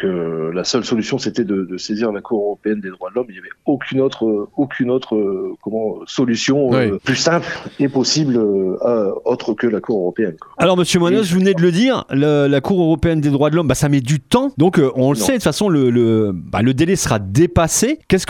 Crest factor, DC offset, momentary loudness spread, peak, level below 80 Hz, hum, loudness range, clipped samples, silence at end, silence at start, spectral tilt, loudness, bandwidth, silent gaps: 16 dB; under 0.1%; 8 LU; 0 dBFS; -42 dBFS; none; 5 LU; under 0.1%; 0.05 s; 0 s; -5.5 dB/octave; -17 LUFS; 16.5 kHz; none